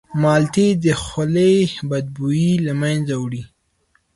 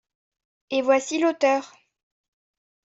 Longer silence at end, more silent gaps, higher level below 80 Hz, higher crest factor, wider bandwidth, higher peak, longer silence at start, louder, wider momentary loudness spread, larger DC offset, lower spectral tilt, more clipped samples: second, 0.7 s vs 1.25 s; neither; first, -48 dBFS vs -74 dBFS; about the same, 14 dB vs 18 dB; first, 11.5 kHz vs 8 kHz; first, -4 dBFS vs -8 dBFS; second, 0.1 s vs 0.7 s; first, -18 LUFS vs -23 LUFS; first, 9 LU vs 6 LU; neither; first, -6.5 dB/octave vs -2 dB/octave; neither